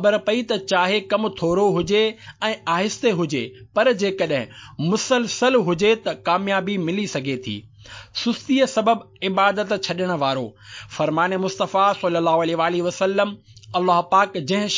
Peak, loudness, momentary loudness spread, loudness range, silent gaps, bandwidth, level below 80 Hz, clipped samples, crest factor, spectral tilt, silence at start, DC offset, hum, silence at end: -4 dBFS; -21 LUFS; 9 LU; 2 LU; none; 7.6 kHz; -58 dBFS; under 0.1%; 18 dB; -4.5 dB/octave; 0 s; under 0.1%; none; 0 s